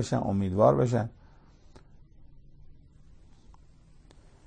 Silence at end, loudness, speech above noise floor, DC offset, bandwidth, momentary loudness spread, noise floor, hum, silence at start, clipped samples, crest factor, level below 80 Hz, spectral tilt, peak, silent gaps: 2.2 s; -26 LUFS; 30 dB; under 0.1%; 9.8 kHz; 9 LU; -55 dBFS; none; 0 s; under 0.1%; 22 dB; -54 dBFS; -7.5 dB/octave; -10 dBFS; none